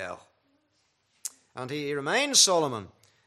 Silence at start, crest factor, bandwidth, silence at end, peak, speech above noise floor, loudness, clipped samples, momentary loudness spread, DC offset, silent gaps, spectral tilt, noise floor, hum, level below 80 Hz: 0 s; 22 dB; 15 kHz; 0.4 s; -8 dBFS; 46 dB; -23 LUFS; under 0.1%; 20 LU; under 0.1%; none; -1.5 dB/octave; -72 dBFS; none; -78 dBFS